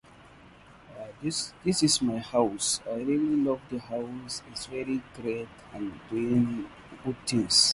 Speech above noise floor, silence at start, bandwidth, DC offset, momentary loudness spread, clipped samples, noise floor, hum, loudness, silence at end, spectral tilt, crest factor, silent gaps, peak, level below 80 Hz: 24 dB; 0.2 s; 11.5 kHz; under 0.1%; 14 LU; under 0.1%; -53 dBFS; none; -29 LUFS; 0 s; -3.5 dB/octave; 22 dB; none; -8 dBFS; -58 dBFS